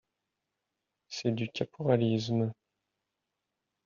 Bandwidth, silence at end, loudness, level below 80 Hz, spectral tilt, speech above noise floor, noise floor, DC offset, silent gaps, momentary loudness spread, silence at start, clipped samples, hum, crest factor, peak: 7.2 kHz; 1.35 s; -31 LUFS; -70 dBFS; -6.5 dB/octave; 56 dB; -86 dBFS; under 0.1%; none; 8 LU; 1.1 s; under 0.1%; none; 22 dB; -12 dBFS